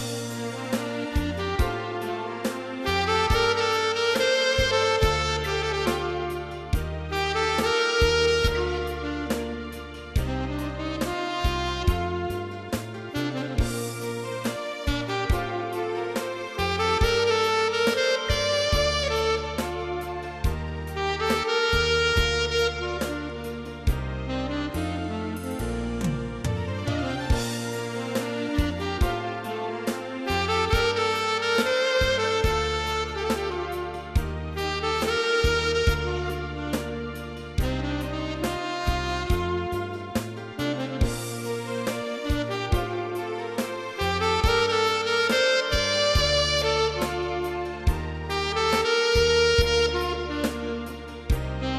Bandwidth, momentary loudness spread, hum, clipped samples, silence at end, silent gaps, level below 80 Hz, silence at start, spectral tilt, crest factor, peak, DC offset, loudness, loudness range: 14 kHz; 10 LU; none; under 0.1%; 0 s; none; -34 dBFS; 0 s; -4.5 dB/octave; 18 dB; -8 dBFS; under 0.1%; -26 LUFS; 6 LU